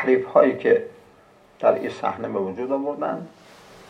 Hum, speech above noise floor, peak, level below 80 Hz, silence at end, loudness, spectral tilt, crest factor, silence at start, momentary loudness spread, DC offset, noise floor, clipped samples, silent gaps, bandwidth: none; 32 dB; -2 dBFS; -68 dBFS; 0.6 s; -22 LUFS; -7 dB/octave; 20 dB; 0 s; 12 LU; under 0.1%; -53 dBFS; under 0.1%; none; 9 kHz